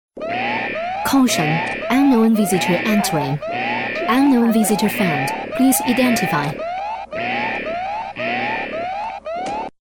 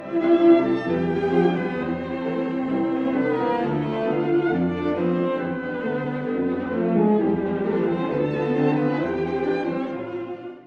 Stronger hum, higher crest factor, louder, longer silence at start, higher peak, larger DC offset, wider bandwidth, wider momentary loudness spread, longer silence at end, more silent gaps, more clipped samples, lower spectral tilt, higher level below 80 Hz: neither; about the same, 14 dB vs 18 dB; first, -19 LUFS vs -23 LUFS; first, 0.15 s vs 0 s; about the same, -4 dBFS vs -4 dBFS; neither; first, 19.5 kHz vs 5.8 kHz; about the same, 10 LU vs 8 LU; first, 0.2 s vs 0.05 s; neither; neither; second, -4.5 dB/octave vs -9 dB/octave; about the same, -52 dBFS vs -54 dBFS